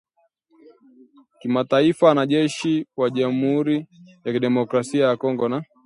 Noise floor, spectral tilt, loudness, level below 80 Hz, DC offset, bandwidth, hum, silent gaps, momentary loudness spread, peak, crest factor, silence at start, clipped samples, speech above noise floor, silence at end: -64 dBFS; -6 dB/octave; -21 LUFS; -68 dBFS; under 0.1%; 11 kHz; none; none; 9 LU; -4 dBFS; 18 dB; 1.45 s; under 0.1%; 44 dB; 0.2 s